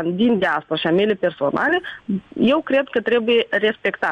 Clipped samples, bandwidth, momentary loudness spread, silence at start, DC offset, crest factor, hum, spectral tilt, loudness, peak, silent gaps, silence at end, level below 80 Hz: under 0.1%; 8 kHz; 5 LU; 0 s; under 0.1%; 12 dB; none; -7 dB/octave; -19 LUFS; -8 dBFS; none; 0 s; -58 dBFS